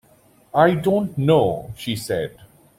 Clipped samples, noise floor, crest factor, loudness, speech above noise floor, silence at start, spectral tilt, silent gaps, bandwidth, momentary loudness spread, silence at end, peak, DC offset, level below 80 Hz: under 0.1%; -55 dBFS; 18 dB; -20 LUFS; 35 dB; 0.55 s; -6.5 dB/octave; none; 16.5 kHz; 11 LU; 0.35 s; -2 dBFS; under 0.1%; -52 dBFS